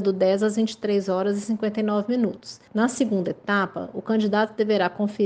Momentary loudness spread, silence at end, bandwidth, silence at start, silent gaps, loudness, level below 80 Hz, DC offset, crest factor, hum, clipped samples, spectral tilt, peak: 5 LU; 0 s; 9.4 kHz; 0 s; none; -24 LUFS; -68 dBFS; under 0.1%; 16 dB; none; under 0.1%; -6 dB/octave; -8 dBFS